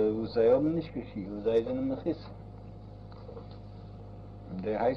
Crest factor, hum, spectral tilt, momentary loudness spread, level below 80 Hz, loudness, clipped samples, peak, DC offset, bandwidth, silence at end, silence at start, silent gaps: 18 dB; none; -9.5 dB/octave; 21 LU; -52 dBFS; -30 LUFS; under 0.1%; -14 dBFS; under 0.1%; 6 kHz; 0 s; 0 s; none